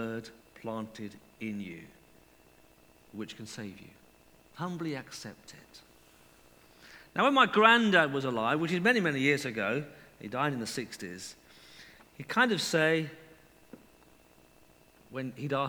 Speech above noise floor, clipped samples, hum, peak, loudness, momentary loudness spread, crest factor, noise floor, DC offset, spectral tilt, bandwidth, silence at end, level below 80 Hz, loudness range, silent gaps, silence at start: 31 dB; under 0.1%; none; -6 dBFS; -29 LUFS; 23 LU; 26 dB; -61 dBFS; under 0.1%; -4.5 dB/octave; over 20 kHz; 0 s; -70 dBFS; 17 LU; none; 0 s